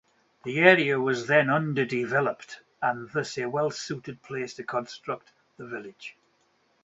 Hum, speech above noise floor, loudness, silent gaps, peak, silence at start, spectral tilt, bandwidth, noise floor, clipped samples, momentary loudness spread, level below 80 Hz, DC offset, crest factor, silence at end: none; 41 dB; -26 LUFS; none; -4 dBFS; 0.45 s; -5.5 dB/octave; 8 kHz; -68 dBFS; under 0.1%; 20 LU; -72 dBFS; under 0.1%; 24 dB; 0.75 s